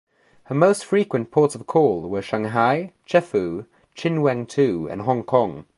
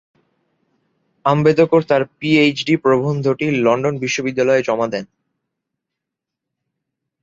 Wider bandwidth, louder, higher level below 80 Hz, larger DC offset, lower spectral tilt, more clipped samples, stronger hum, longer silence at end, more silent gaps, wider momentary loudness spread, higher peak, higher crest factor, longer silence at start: first, 11.5 kHz vs 7.8 kHz; second, -21 LUFS vs -16 LUFS; about the same, -58 dBFS vs -58 dBFS; neither; about the same, -6.5 dB/octave vs -6 dB/octave; neither; neither; second, 0.15 s vs 2.2 s; neither; about the same, 7 LU vs 6 LU; about the same, -2 dBFS vs -2 dBFS; about the same, 20 dB vs 16 dB; second, 0.5 s vs 1.25 s